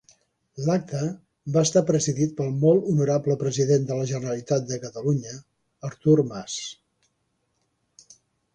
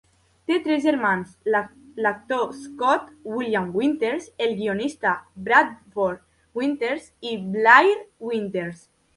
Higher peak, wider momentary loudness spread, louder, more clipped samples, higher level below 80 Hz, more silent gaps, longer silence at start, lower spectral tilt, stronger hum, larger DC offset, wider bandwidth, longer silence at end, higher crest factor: second, -6 dBFS vs 0 dBFS; first, 15 LU vs 12 LU; about the same, -24 LUFS vs -22 LUFS; neither; about the same, -62 dBFS vs -64 dBFS; neither; about the same, 0.55 s vs 0.5 s; about the same, -6 dB/octave vs -5.5 dB/octave; neither; neither; second, 10 kHz vs 11.5 kHz; first, 1.8 s vs 0.4 s; about the same, 18 dB vs 22 dB